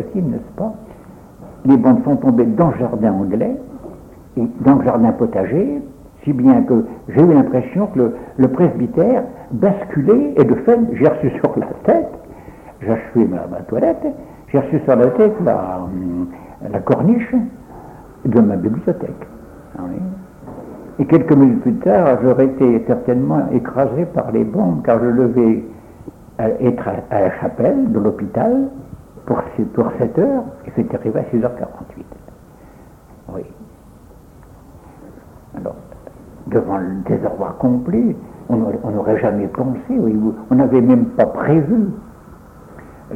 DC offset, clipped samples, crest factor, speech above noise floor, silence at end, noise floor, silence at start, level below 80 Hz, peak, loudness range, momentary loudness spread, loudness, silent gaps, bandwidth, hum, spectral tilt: under 0.1%; under 0.1%; 16 dB; 27 dB; 0 s; -42 dBFS; 0 s; -46 dBFS; 0 dBFS; 7 LU; 18 LU; -16 LUFS; none; 3.6 kHz; none; -10.5 dB/octave